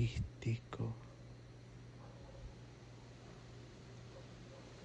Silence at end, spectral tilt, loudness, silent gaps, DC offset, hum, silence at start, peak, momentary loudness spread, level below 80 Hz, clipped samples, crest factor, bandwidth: 0 s; -6.5 dB/octave; -49 LUFS; none; under 0.1%; none; 0 s; -26 dBFS; 14 LU; -58 dBFS; under 0.1%; 20 dB; 8.6 kHz